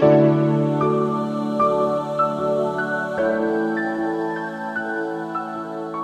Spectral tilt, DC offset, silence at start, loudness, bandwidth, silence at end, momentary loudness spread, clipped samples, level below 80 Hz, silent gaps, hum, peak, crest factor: -8.5 dB/octave; under 0.1%; 0 s; -22 LUFS; 9.6 kHz; 0 s; 9 LU; under 0.1%; -60 dBFS; none; none; -4 dBFS; 18 dB